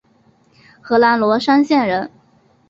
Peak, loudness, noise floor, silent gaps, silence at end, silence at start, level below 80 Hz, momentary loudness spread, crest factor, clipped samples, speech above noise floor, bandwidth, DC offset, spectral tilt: -2 dBFS; -15 LUFS; -55 dBFS; none; 0.6 s; 0.85 s; -60 dBFS; 8 LU; 16 dB; under 0.1%; 41 dB; 7.6 kHz; under 0.1%; -6 dB/octave